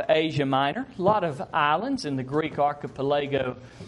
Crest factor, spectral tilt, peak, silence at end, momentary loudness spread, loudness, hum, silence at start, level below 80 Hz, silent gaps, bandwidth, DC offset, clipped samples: 18 dB; -6.5 dB/octave; -8 dBFS; 0 s; 5 LU; -26 LUFS; none; 0 s; -58 dBFS; none; 11.5 kHz; under 0.1%; under 0.1%